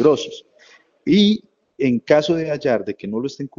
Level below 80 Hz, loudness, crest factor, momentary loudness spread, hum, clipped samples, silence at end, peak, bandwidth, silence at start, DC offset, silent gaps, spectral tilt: -56 dBFS; -19 LUFS; 18 dB; 12 LU; none; under 0.1%; 0.1 s; 0 dBFS; 7.4 kHz; 0 s; under 0.1%; none; -6 dB/octave